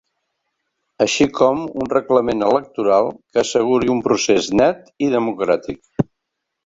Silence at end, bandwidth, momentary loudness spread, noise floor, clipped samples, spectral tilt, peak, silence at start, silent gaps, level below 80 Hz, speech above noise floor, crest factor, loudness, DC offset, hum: 0.65 s; 8 kHz; 7 LU; -78 dBFS; under 0.1%; -4.5 dB/octave; -2 dBFS; 1 s; none; -52 dBFS; 61 dB; 16 dB; -18 LUFS; under 0.1%; none